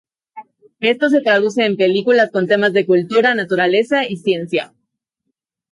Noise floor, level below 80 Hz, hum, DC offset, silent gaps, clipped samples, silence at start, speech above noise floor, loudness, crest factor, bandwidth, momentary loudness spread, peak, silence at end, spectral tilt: -75 dBFS; -68 dBFS; none; under 0.1%; none; under 0.1%; 0.35 s; 60 dB; -15 LUFS; 14 dB; 11.5 kHz; 6 LU; -2 dBFS; 1.05 s; -5.5 dB/octave